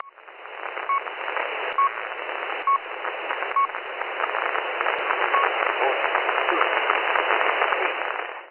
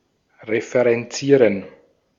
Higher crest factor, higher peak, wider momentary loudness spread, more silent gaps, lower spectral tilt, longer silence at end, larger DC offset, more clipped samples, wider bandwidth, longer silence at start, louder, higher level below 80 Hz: about the same, 22 dB vs 18 dB; about the same, -2 dBFS vs -2 dBFS; second, 9 LU vs 12 LU; neither; about the same, -4.5 dB/octave vs -5.5 dB/octave; second, 0 s vs 0.5 s; neither; neither; second, 4.5 kHz vs 7.6 kHz; second, 0.05 s vs 0.45 s; second, -24 LUFS vs -19 LUFS; second, -72 dBFS vs -66 dBFS